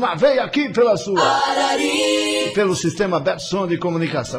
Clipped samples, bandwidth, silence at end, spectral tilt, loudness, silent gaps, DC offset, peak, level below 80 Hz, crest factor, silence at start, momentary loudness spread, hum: under 0.1%; 15 kHz; 0 s; -4 dB/octave; -18 LUFS; none; under 0.1%; -4 dBFS; -52 dBFS; 14 dB; 0 s; 5 LU; none